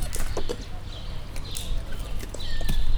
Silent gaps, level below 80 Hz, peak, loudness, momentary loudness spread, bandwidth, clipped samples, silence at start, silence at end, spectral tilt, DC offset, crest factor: none; -28 dBFS; -8 dBFS; -34 LUFS; 7 LU; 18 kHz; under 0.1%; 0 s; 0 s; -4 dB/octave; under 0.1%; 16 dB